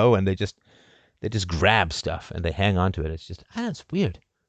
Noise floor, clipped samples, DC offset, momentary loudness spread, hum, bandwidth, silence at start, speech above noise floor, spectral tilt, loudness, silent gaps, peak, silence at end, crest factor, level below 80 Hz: -57 dBFS; under 0.1%; under 0.1%; 12 LU; none; 9 kHz; 0 s; 33 dB; -5.5 dB/octave; -25 LUFS; none; -4 dBFS; 0.3 s; 22 dB; -38 dBFS